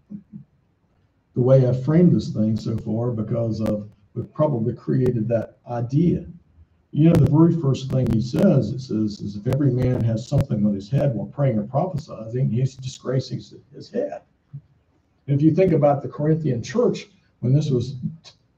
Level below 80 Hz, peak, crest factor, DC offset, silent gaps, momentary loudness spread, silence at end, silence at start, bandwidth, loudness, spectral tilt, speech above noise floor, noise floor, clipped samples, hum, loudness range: -46 dBFS; -4 dBFS; 18 dB; under 0.1%; none; 14 LU; 0.3 s; 0.1 s; 8 kHz; -21 LUFS; -9 dB/octave; 43 dB; -63 dBFS; under 0.1%; none; 6 LU